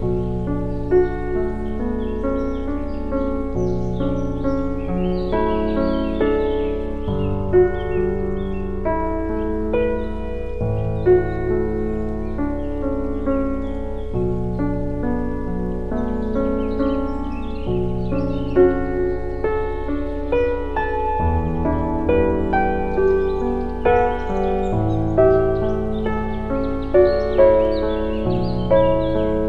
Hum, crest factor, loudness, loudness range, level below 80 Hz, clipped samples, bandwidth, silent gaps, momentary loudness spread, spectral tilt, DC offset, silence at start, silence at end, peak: none; 18 dB; -21 LUFS; 5 LU; -28 dBFS; under 0.1%; 6.2 kHz; none; 9 LU; -9.5 dB/octave; under 0.1%; 0 s; 0 s; -2 dBFS